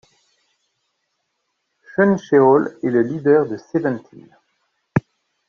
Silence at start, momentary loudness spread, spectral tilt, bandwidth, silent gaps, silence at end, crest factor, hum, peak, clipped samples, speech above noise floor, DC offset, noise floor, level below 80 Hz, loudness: 2 s; 10 LU; -7.5 dB/octave; 6.8 kHz; none; 0.5 s; 18 dB; none; -2 dBFS; under 0.1%; 57 dB; under 0.1%; -73 dBFS; -60 dBFS; -18 LUFS